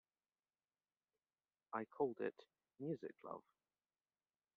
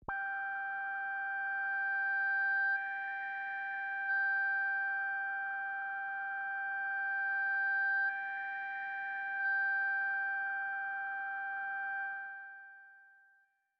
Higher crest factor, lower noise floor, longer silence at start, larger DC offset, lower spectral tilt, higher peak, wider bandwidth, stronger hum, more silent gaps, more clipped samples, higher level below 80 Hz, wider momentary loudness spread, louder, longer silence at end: first, 24 dB vs 10 dB; first, under -90 dBFS vs -72 dBFS; first, 1.7 s vs 0 s; neither; first, -6.5 dB/octave vs 2 dB/octave; about the same, -28 dBFS vs -26 dBFS; second, 4.5 kHz vs 5 kHz; neither; neither; neither; second, under -90 dBFS vs -76 dBFS; first, 12 LU vs 7 LU; second, -48 LUFS vs -35 LUFS; first, 1.15 s vs 0.7 s